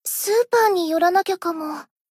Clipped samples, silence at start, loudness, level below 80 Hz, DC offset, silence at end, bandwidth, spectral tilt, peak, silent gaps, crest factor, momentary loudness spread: under 0.1%; 0.05 s; -20 LUFS; -74 dBFS; under 0.1%; 0.25 s; 16 kHz; -1.5 dB/octave; -6 dBFS; none; 14 dB; 12 LU